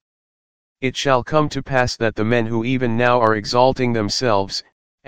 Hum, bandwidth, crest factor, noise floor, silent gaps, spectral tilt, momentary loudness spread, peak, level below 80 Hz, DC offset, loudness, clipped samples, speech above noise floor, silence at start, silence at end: none; 15 kHz; 18 dB; under -90 dBFS; 0.01-0.76 s, 4.72-4.98 s; -5 dB/octave; 5 LU; 0 dBFS; -44 dBFS; 2%; -19 LUFS; under 0.1%; over 72 dB; 0 s; 0 s